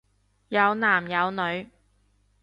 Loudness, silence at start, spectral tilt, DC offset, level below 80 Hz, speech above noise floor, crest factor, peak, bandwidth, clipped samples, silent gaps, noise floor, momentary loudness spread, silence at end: -24 LUFS; 0.5 s; -6.5 dB/octave; under 0.1%; -66 dBFS; 41 dB; 20 dB; -8 dBFS; 10.5 kHz; under 0.1%; none; -65 dBFS; 8 LU; 0.75 s